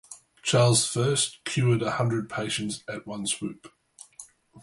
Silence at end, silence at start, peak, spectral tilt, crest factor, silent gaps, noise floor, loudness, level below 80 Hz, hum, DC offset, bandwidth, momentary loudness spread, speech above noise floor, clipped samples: 0 s; 0.1 s; -10 dBFS; -4 dB/octave; 18 dB; none; -51 dBFS; -26 LUFS; -62 dBFS; none; under 0.1%; 11.5 kHz; 24 LU; 25 dB; under 0.1%